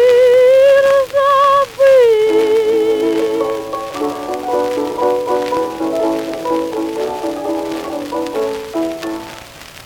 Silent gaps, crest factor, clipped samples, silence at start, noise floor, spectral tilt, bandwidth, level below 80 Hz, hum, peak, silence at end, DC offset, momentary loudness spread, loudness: none; 12 dB; under 0.1%; 0 s; -35 dBFS; -4 dB/octave; 18 kHz; -50 dBFS; none; -2 dBFS; 0 s; under 0.1%; 13 LU; -14 LUFS